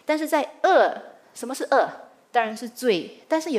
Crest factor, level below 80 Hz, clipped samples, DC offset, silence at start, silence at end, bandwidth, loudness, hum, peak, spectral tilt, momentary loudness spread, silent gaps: 18 dB; -84 dBFS; under 0.1%; under 0.1%; 0.1 s; 0 s; 15.5 kHz; -23 LUFS; none; -6 dBFS; -3.5 dB/octave; 14 LU; none